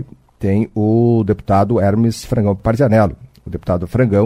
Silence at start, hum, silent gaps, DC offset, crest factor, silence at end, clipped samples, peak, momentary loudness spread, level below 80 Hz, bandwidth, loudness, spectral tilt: 0 s; none; none; under 0.1%; 14 dB; 0 s; under 0.1%; 0 dBFS; 11 LU; -38 dBFS; 13.5 kHz; -16 LUFS; -8.5 dB/octave